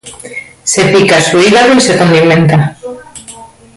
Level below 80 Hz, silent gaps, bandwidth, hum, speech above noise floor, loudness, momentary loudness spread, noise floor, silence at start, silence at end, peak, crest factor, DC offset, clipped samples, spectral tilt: -44 dBFS; none; 11.5 kHz; none; 26 dB; -7 LUFS; 20 LU; -33 dBFS; 0.05 s; 0.3 s; 0 dBFS; 10 dB; under 0.1%; under 0.1%; -4.5 dB/octave